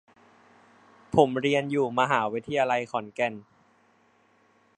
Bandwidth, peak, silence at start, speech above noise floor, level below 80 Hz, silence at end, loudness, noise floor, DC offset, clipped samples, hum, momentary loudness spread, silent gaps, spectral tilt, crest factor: 9.6 kHz; -4 dBFS; 1.1 s; 38 dB; -64 dBFS; 1.35 s; -26 LUFS; -64 dBFS; under 0.1%; under 0.1%; none; 7 LU; none; -5.5 dB/octave; 24 dB